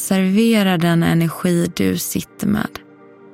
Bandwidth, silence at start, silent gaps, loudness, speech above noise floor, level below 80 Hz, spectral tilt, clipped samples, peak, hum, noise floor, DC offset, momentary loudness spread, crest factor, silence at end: 16.5 kHz; 0 s; none; -17 LUFS; 27 dB; -48 dBFS; -5.5 dB/octave; under 0.1%; -4 dBFS; none; -44 dBFS; under 0.1%; 8 LU; 14 dB; 0.55 s